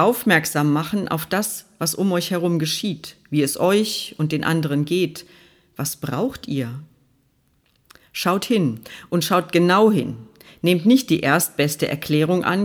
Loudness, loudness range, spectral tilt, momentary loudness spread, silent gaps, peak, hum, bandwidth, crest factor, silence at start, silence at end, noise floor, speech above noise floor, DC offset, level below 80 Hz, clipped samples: -20 LUFS; 7 LU; -5 dB/octave; 11 LU; none; -2 dBFS; none; over 20 kHz; 18 dB; 0 s; 0 s; -63 dBFS; 43 dB; under 0.1%; -58 dBFS; under 0.1%